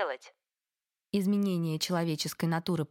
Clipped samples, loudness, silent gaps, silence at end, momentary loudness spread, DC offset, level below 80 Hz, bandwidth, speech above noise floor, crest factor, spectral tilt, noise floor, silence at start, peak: under 0.1%; -31 LUFS; none; 0.05 s; 6 LU; under 0.1%; -74 dBFS; 17 kHz; over 59 dB; 16 dB; -5.5 dB/octave; under -90 dBFS; 0 s; -16 dBFS